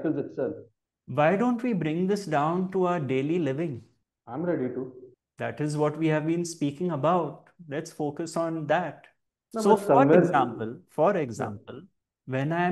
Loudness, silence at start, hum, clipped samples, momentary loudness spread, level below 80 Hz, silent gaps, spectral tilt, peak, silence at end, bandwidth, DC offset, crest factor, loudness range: -27 LUFS; 0 s; none; under 0.1%; 14 LU; -72 dBFS; none; -7 dB/octave; -6 dBFS; 0 s; 12.5 kHz; under 0.1%; 20 dB; 6 LU